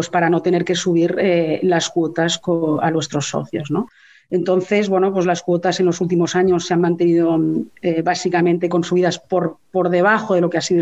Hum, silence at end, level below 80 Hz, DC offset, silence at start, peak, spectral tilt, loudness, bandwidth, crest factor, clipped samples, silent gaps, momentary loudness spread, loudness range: none; 0 s; -60 dBFS; 0.2%; 0 s; -2 dBFS; -5.5 dB/octave; -18 LUFS; 8.2 kHz; 16 dB; under 0.1%; none; 6 LU; 2 LU